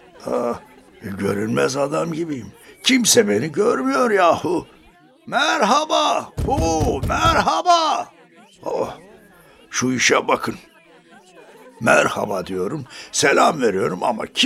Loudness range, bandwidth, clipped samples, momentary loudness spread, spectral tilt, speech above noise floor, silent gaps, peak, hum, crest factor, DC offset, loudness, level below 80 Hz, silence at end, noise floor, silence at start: 4 LU; 16 kHz; under 0.1%; 12 LU; -3.5 dB/octave; 32 dB; none; 0 dBFS; none; 20 dB; under 0.1%; -19 LUFS; -40 dBFS; 0 s; -51 dBFS; 0.2 s